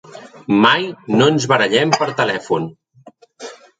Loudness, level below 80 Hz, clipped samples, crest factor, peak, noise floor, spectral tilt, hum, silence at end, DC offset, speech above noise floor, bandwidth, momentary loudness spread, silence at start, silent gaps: -16 LUFS; -60 dBFS; under 0.1%; 18 dB; 0 dBFS; -46 dBFS; -4.5 dB/octave; none; 0.25 s; under 0.1%; 31 dB; 9.4 kHz; 21 LU; 0.15 s; none